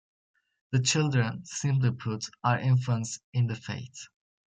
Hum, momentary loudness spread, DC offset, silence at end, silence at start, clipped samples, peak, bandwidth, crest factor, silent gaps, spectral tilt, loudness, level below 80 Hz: none; 13 LU; under 0.1%; 0.45 s; 0.7 s; under 0.1%; -12 dBFS; 9.4 kHz; 18 dB; 3.24-3.33 s; -5 dB/octave; -28 LUFS; -68 dBFS